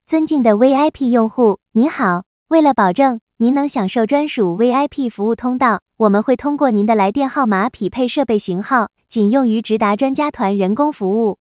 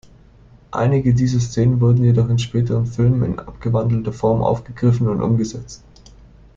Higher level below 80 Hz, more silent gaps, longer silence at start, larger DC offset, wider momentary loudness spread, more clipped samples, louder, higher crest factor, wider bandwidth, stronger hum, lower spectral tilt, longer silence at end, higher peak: second, -54 dBFS vs -40 dBFS; first, 2.26-2.46 s, 3.22-3.27 s, 5.82-5.86 s vs none; second, 0.1 s vs 0.7 s; neither; second, 5 LU vs 9 LU; neither; about the same, -16 LUFS vs -18 LUFS; about the same, 16 dB vs 14 dB; second, 4 kHz vs 7.4 kHz; neither; first, -11 dB/octave vs -8 dB/octave; second, 0.25 s vs 0.8 s; first, 0 dBFS vs -4 dBFS